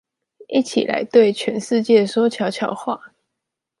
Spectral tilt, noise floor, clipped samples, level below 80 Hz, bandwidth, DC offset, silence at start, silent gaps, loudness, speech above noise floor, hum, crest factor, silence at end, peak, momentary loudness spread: -5 dB/octave; -81 dBFS; under 0.1%; -70 dBFS; 11.5 kHz; under 0.1%; 0.4 s; none; -19 LUFS; 63 dB; none; 18 dB; 0.75 s; -2 dBFS; 10 LU